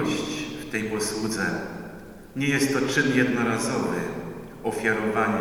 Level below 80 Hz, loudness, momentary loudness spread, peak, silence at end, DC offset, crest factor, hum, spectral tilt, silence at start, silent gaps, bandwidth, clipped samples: -52 dBFS; -25 LUFS; 14 LU; -8 dBFS; 0 s; under 0.1%; 18 dB; none; -4.5 dB/octave; 0 s; none; over 20 kHz; under 0.1%